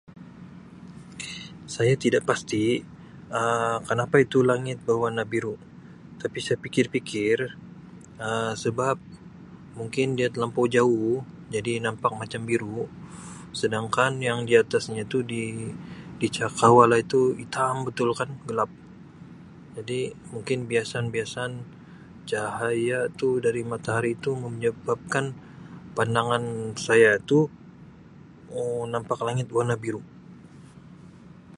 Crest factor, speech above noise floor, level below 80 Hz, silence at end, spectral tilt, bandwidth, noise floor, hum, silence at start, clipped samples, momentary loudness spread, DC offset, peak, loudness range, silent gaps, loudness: 24 dB; 23 dB; -60 dBFS; 0 s; -5.5 dB/octave; 11.5 kHz; -48 dBFS; none; 0.1 s; under 0.1%; 21 LU; under 0.1%; -2 dBFS; 7 LU; none; -25 LUFS